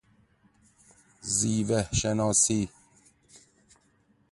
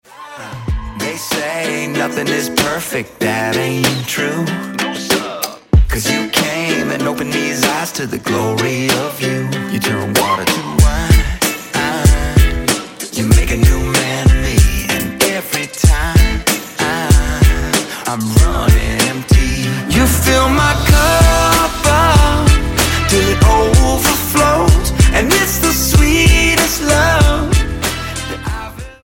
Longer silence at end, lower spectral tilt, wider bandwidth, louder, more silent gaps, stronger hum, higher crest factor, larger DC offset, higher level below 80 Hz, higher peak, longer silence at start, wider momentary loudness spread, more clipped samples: first, 1.65 s vs 0.1 s; about the same, -4 dB/octave vs -4.5 dB/octave; second, 11.5 kHz vs 17 kHz; second, -26 LUFS vs -14 LUFS; neither; neither; first, 20 dB vs 14 dB; neither; second, -50 dBFS vs -18 dBFS; second, -10 dBFS vs 0 dBFS; first, 1.25 s vs 0.2 s; about the same, 10 LU vs 9 LU; neither